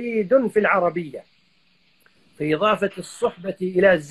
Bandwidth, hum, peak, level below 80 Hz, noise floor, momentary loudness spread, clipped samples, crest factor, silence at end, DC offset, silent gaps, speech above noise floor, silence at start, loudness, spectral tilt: 12.5 kHz; none; -4 dBFS; -60 dBFS; -62 dBFS; 12 LU; under 0.1%; 18 dB; 0 s; under 0.1%; none; 42 dB; 0 s; -21 LUFS; -6 dB/octave